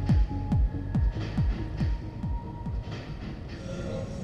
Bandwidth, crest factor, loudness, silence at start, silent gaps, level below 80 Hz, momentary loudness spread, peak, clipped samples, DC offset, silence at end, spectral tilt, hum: 8 kHz; 14 dB; -32 LUFS; 0 s; none; -32 dBFS; 10 LU; -14 dBFS; under 0.1%; under 0.1%; 0 s; -8 dB/octave; none